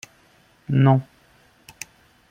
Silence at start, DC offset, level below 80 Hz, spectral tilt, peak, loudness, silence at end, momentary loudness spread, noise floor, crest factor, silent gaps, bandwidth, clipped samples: 0.7 s; under 0.1%; -62 dBFS; -7.5 dB/octave; -4 dBFS; -20 LUFS; 1.25 s; 22 LU; -57 dBFS; 20 dB; none; 10.5 kHz; under 0.1%